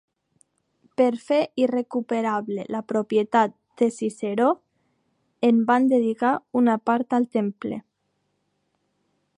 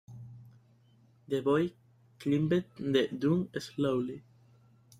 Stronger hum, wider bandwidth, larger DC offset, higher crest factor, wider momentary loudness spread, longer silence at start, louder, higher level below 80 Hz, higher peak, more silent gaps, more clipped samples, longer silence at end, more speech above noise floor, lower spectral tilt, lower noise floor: neither; second, 10.5 kHz vs 14.5 kHz; neither; about the same, 18 dB vs 18 dB; second, 9 LU vs 18 LU; first, 1 s vs 0.1 s; first, -23 LUFS vs -31 LUFS; second, -76 dBFS vs -68 dBFS; first, -6 dBFS vs -14 dBFS; neither; neither; first, 1.6 s vs 0.8 s; first, 51 dB vs 33 dB; about the same, -6.5 dB/octave vs -7 dB/octave; first, -73 dBFS vs -64 dBFS